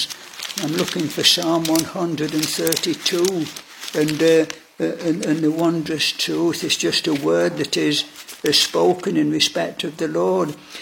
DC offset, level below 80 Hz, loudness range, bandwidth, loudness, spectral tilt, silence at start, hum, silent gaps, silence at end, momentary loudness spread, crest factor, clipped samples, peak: under 0.1%; -64 dBFS; 2 LU; 17 kHz; -19 LUFS; -3.5 dB/octave; 0 s; none; none; 0 s; 10 LU; 20 dB; under 0.1%; 0 dBFS